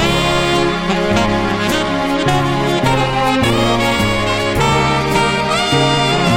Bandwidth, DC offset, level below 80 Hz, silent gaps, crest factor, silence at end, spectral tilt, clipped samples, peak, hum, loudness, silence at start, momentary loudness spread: 17 kHz; under 0.1%; -30 dBFS; none; 12 dB; 0 s; -4.5 dB/octave; under 0.1%; -2 dBFS; none; -14 LUFS; 0 s; 3 LU